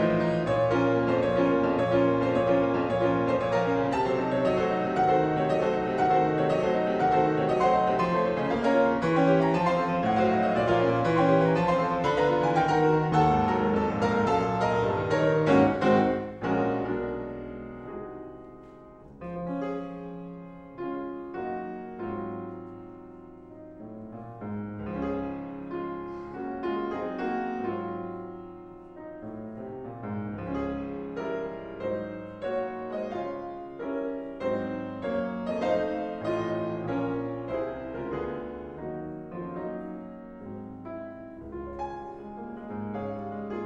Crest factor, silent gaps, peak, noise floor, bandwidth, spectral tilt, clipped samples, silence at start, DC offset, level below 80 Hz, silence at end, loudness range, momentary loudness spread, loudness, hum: 20 dB; none; -8 dBFS; -48 dBFS; 9 kHz; -7.5 dB/octave; under 0.1%; 0 s; under 0.1%; -52 dBFS; 0 s; 14 LU; 17 LU; -27 LUFS; none